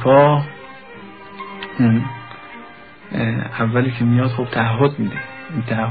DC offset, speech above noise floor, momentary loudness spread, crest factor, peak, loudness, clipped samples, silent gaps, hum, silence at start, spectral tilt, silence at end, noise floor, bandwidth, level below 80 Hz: 0.3%; 24 dB; 21 LU; 18 dB; -2 dBFS; -18 LUFS; under 0.1%; none; none; 0 s; -12.5 dB/octave; 0 s; -40 dBFS; 4.9 kHz; -52 dBFS